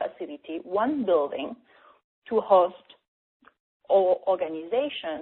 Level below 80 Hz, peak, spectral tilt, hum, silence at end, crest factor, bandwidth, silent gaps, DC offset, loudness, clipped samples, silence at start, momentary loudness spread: -72 dBFS; -8 dBFS; -3 dB/octave; none; 0 s; 20 dB; 4.2 kHz; 2.04-2.22 s, 3.08-3.40 s, 3.60-3.80 s; under 0.1%; -25 LUFS; under 0.1%; 0 s; 15 LU